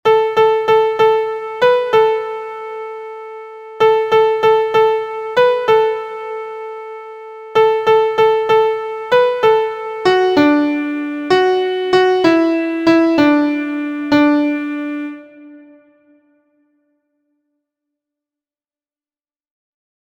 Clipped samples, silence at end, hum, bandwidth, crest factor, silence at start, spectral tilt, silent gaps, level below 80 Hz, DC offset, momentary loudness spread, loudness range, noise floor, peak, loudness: under 0.1%; 4.45 s; none; 15 kHz; 16 dB; 0.05 s; -5.5 dB/octave; none; -58 dBFS; under 0.1%; 16 LU; 5 LU; under -90 dBFS; 0 dBFS; -14 LUFS